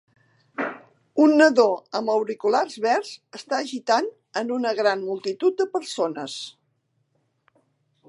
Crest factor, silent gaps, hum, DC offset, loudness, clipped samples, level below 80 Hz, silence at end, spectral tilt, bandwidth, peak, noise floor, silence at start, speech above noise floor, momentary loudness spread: 20 dB; none; none; under 0.1%; -23 LUFS; under 0.1%; -84 dBFS; 1.6 s; -3.5 dB/octave; 11.5 kHz; -4 dBFS; -71 dBFS; 0.6 s; 49 dB; 15 LU